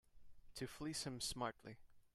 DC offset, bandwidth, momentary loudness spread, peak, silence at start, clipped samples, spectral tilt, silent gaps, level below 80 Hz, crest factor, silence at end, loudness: under 0.1%; 14.5 kHz; 16 LU; -30 dBFS; 0.05 s; under 0.1%; -3.5 dB/octave; none; -66 dBFS; 20 dB; 0.1 s; -46 LUFS